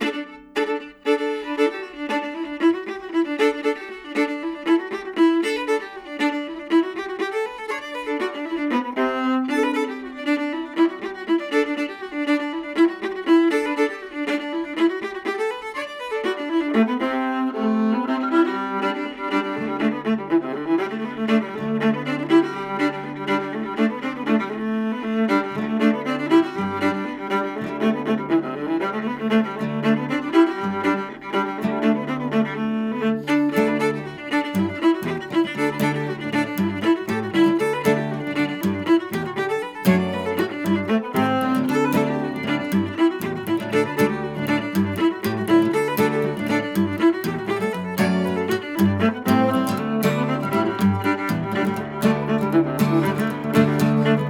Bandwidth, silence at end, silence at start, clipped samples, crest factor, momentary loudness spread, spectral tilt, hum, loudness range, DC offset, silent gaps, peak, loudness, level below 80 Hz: 17.5 kHz; 0 s; 0 s; under 0.1%; 18 dB; 7 LU; -6.5 dB/octave; none; 2 LU; under 0.1%; none; -4 dBFS; -22 LUFS; -60 dBFS